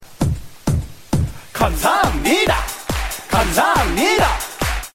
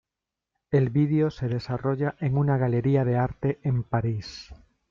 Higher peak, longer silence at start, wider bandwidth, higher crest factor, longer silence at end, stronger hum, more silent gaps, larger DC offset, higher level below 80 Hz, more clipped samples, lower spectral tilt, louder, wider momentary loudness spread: first, -2 dBFS vs -12 dBFS; second, 0 s vs 0.7 s; first, 16.5 kHz vs 6.8 kHz; about the same, 16 dB vs 14 dB; second, 0.05 s vs 0.35 s; neither; neither; neither; first, -28 dBFS vs -52 dBFS; neither; second, -4 dB/octave vs -9 dB/octave; first, -18 LUFS vs -25 LUFS; about the same, 8 LU vs 7 LU